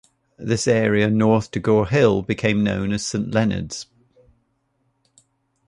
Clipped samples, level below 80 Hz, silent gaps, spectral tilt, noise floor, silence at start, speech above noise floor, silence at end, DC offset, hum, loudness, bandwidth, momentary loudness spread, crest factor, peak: under 0.1%; -46 dBFS; none; -6 dB/octave; -68 dBFS; 0.4 s; 49 dB; 1.85 s; under 0.1%; none; -20 LUFS; 11 kHz; 12 LU; 18 dB; -4 dBFS